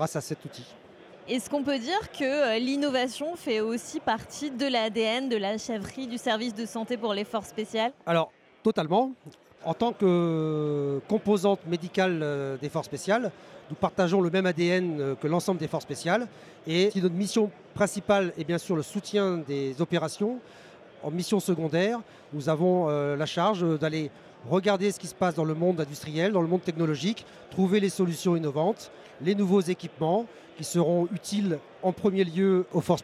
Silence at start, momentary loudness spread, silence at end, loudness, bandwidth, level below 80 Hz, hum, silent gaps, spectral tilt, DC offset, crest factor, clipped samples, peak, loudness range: 0 s; 9 LU; 0 s; -28 LUFS; 14.5 kHz; -68 dBFS; none; none; -5.5 dB/octave; under 0.1%; 18 dB; under 0.1%; -8 dBFS; 2 LU